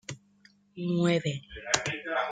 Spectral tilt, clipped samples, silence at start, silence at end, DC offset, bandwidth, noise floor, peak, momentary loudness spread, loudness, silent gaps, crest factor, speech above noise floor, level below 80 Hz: -4 dB/octave; under 0.1%; 0.1 s; 0 s; under 0.1%; 9.4 kHz; -62 dBFS; -6 dBFS; 19 LU; -29 LUFS; none; 26 dB; 33 dB; -60 dBFS